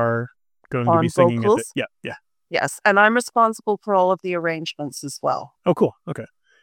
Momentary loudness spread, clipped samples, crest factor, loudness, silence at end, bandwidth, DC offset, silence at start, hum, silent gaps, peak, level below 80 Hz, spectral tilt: 17 LU; under 0.1%; 20 dB; -20 LUFS; 0.4 s; 17 kHz; under 0.1%; 0 s; none; none; -2 dBFS; -64 dBFS; -5.5 dB/octave